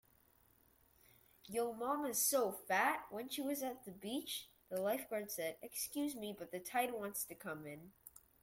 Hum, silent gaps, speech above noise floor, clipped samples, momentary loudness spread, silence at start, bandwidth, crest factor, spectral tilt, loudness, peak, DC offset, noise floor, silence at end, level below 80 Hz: none; none; 31 dB; under 0.1%; 13 LU; 1.45 s; 16.5 kHz; 20 dB; -2.5 dB/octave; -41 LUFS; -22 dBFS; under 0.1%; -72 dBFS; 0.35 s; -78 dBFS